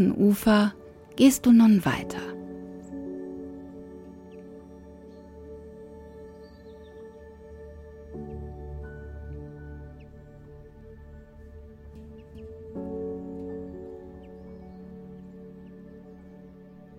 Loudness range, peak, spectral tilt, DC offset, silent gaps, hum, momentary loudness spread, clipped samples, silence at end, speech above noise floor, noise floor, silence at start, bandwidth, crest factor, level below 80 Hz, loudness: 22 LU; -6 dBFS; -6 dB/octave; under 0.1%; none; none; 27 LU; under 0.1%; 0.5 s; 28 dB; -48 dBFS; 0 s; 16.5 kHz; 22 dB; -50 dBFS; -24 LUFS